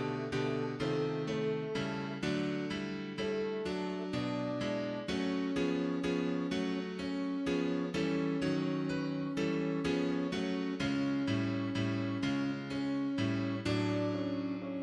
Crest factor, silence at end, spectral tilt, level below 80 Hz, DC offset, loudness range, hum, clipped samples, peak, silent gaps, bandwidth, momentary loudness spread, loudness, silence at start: 14 dB; 0 s; -6.5 dB/octave; -62 dBFS; under 0.1%; 2 LU; none; under 0.1%; -20 dBFS; none; 10.5 kHz; 4 LU; -35 LUFS; 0 s